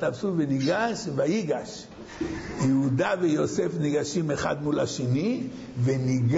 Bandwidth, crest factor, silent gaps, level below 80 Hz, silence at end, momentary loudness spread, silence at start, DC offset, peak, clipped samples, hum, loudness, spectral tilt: 8 kHz; 12 dB; none; -54 dBFS; 0 s; 9 LU; 0 s; under 0.1%; -12 dBFS; under 0.1%; none; -27 LUFS; -6.5 dB/octave